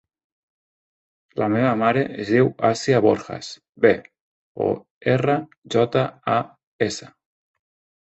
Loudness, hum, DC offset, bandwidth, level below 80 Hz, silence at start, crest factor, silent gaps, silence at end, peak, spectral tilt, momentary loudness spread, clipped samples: -21 LUFS; none; under 0.1%; 8.2 kHz; -58 dBFS; 1.35 s; 20 dB; 3.69-3.73 s, 4.21-4.55 s, 4.90-5.01 s, 5.58-5.62 s, 6.67-6.79 s; 0.95 s; -2 dBFS; -6 dB/octave; 11 LU; under 0.1%